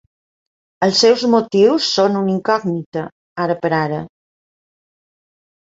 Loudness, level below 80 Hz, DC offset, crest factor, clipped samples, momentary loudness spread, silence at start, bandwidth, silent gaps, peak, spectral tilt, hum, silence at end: -16 LUFS; -60 dBFS; under 0.1%; 16 dB; under 0.1%; 14 LU; 0.8 s; 8 kHz; 2.86-2.92 s, 3.12-3.36 s; -2 dBFS; -5 dB/octave; none; 1.55 s